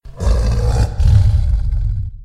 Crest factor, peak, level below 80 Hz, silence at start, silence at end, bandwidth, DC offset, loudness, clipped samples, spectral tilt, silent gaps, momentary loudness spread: 12 dB; -2 dBFS; -16 dBFS; 0.05 s; 0 s; 10.5 kHz; under 0.1%; -17 LUFS; under 0.1%; -7 dB/octave; none; 8 LU